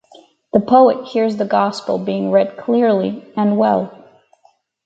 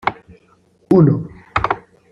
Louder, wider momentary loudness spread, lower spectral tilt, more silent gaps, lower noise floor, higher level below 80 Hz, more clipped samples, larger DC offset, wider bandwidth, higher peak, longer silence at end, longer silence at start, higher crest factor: about the same, -16 LUFS vs -17 LUFS; about the same, 9 LU vs 11 LU; second, -7.5 dB/octave vs -9 dB/octave; neither; about the same, -57 dBFS vs -55 dBFS; second, -62 dBFS vs -42 dBFS; neither; neither; first, 8 kHz vs 6.6 kHz; about the same, 0 dBFS vs -2 dBFS; first, 0.95 s vs 0.35 s; first, 0.55 s vs 0.05 s; about the same, 16 dB vs 16 dB